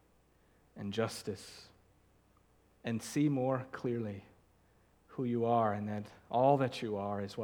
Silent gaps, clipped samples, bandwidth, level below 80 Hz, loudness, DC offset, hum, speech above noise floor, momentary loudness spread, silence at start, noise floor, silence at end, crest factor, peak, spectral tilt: none; under 0.1%; 19.5 kHz; -72 dBFS; -35 LUFS; under 0.1%; none; 34 dB; 16 LU; 0.75 s; -69 dBFS; 0 s; 22 dB; -16 dBFS; -6.5 dB/octave